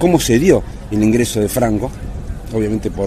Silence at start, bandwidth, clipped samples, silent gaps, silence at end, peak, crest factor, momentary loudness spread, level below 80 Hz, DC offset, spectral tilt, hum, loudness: 0 s; 14.5 kHz; under 0.1%; none; 0 s; 0 dBFS; 16 dB; 14 LU; -30 dBFS; under 0.1%; -5.5 dB/octave; none; -16 LUFS